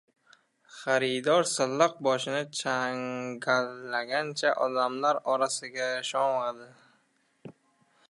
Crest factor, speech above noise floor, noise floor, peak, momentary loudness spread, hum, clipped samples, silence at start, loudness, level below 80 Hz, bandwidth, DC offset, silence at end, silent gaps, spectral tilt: 20 dB; 42 dB; -70 dBFS; -8 dBFS; 8 LU; none; under 0.1%; 0.7 s; -28 LUFS; -84 dBFS; 11.5 kHz; under 0.1%; 0.6 s; none; -3 dB/octave